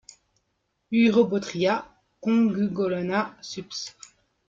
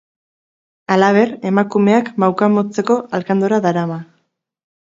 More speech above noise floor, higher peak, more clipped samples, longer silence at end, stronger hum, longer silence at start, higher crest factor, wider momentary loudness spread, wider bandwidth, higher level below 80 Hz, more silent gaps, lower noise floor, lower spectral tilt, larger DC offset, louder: about the same, 51 dB vs 52 dB; second, -8 dBFS vs 0 dBFS; neither; second, 0.6 s vs 0.85 s; neither; about the same, 0.9 s vs 0.9 s; about the same, 18 dB vs 16 dB; first, 14 LU vs 7 LU; about the same, 7.6 kHz vs 7.6 kHz; about the same, -66 dBFS vs -66 dBFS; neither; first, -75 dBFS vs -67 dBFS; second, -5.5 dB/octave vs -7 dB/octave; neither; second, -25 LUFS vs -16 LUFS